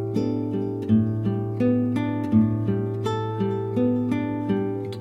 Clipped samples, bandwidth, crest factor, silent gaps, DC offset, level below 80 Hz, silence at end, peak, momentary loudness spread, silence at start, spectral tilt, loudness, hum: under 0.1%; 8 kHz; 16 dB; none; under 0.1%; -54 dBFS; 0 s; -8 dBFS; 5 LU; 0 s; -9 dB/octave; -24 LUFS; none